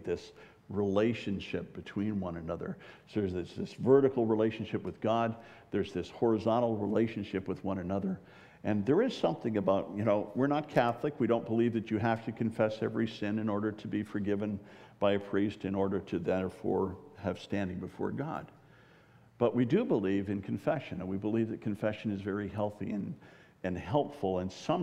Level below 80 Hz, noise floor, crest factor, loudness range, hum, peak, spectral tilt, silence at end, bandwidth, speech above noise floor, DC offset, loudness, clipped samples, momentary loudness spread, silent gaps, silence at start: -66 dBFS; -60 dBFS; 22 dB; 5 LU; none; -12 dBFS; -8 dB/octave; 0 s; 10.5 kHz; 28 dB; under 0.1%; -33 LUFS; under 0.1%; 10 LU; none; 0 s